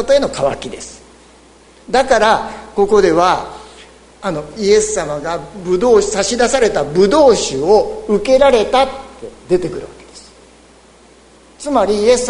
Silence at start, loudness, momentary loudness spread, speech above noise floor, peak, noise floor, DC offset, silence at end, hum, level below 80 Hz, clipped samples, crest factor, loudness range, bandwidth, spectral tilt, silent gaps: 0 s; -14 LUFS; 18 LU; 31 dB; 0 dBFS; -45 dBFS; under 0.1%; 0 s; none; -40 dBFS; under 0.1%; 14 dB; 4 LU; 11 kHz; -4 dB/octave; none